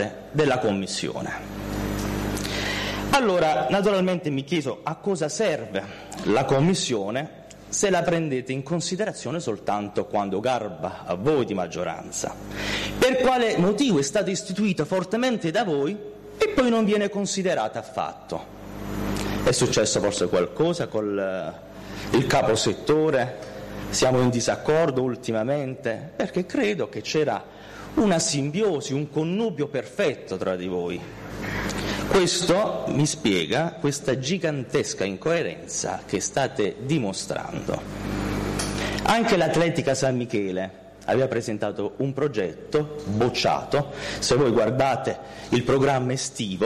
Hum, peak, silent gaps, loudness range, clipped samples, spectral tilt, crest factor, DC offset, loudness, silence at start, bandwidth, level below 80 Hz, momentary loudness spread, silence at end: none; -10 dBFS; none; 3 LU; under 0.1%; -4.5 dB/octave; 14 dB; under 0.1%; -24 LUFS; 0 s; 13 kHz; -46 dBFS; 10 LU; 0 s